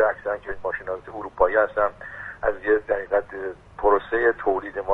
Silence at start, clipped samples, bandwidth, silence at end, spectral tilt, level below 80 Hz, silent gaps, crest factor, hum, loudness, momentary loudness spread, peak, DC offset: 0 s; under 0.1%; 4.1 kHz; 0 s; -7.5 dB/octave; -46 dBFS; none; 20 dB; none; -24 LUFS; 13 LU; -4 dBFS; under 0.1%